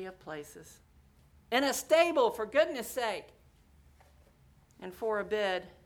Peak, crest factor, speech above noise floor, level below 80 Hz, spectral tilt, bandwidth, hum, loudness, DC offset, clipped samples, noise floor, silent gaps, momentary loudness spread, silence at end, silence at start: -12 dBFS; 20 dB; 31 dB; -66 dBFS; -2.5 dB/octave; over 20 kHz; none; -30 LUFS; under 0.1%; under 0.1%; -63 dBFS; none; 20 LU; 0.15 s; 0 s